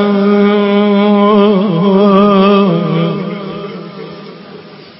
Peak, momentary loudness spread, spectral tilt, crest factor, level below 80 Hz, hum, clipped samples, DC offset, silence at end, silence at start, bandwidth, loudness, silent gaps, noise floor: 0 dBFS; 19 LU; -11 dB/octave; 10 dB; -52 dBFS; none; under 0.1%; under 0.1%; 0.15 s; 0 s; 5.8 kHz; -10 LUFS; none; -33 dBFS